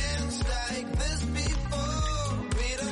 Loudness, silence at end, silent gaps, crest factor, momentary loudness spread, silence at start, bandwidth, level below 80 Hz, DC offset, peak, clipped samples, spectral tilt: -30 LUFS; 0 s; none; 12 dB; 1 LU; 0 s; 11.5 kHz; -32 dBFS; under 0.1%; -16 dBFS; under 0.1%; -4 dB/octave